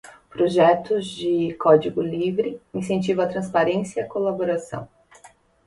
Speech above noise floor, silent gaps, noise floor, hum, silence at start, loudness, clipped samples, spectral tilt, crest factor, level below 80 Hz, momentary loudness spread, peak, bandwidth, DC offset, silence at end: 31 dB; none; -52 dBFS; none; 0.05 s; -22 LUFS; under 0.1%; -6.5 dB/octave; 20 dB; -60 dBFS; 11 LU; -4 dBFS; 11.5 kHz; under 0.1%; 0.4 s